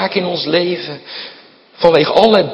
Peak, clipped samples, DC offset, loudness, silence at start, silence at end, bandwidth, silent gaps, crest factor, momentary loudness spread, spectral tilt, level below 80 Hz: 0 dBFS; 0.3%; under 0.1%; -13 LUFS; 0 s; 0 s; 9 kHz; none; 14 dB; 18 LU; -6.5 dB/octave; -54 dBFS